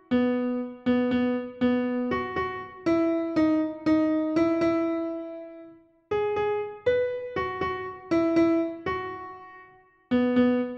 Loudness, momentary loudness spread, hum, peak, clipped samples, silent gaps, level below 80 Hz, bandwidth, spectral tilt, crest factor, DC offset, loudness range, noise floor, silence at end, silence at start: -26 LUFS; 10 LU; none; -12 dBFS; under 0.1%; none; -60 dBFS; 6.8 kHz; -7.5 dB/octave; 14 dB; under 0.1%; 3 LU; -55 dBFS; 0 s; 0.1 s